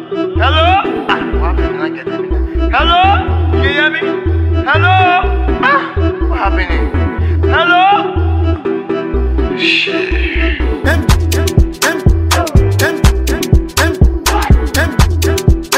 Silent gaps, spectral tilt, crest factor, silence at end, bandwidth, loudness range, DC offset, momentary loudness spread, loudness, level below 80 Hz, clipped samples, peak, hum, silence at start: none; -5 dB/octave; 12 dB; 0 s; 16.5 kHz; 2 LU; under 0.1%; 7 LU; -12 LUFS; -16 dBFS; under 0.1%; 0 dBFS; none; 0 s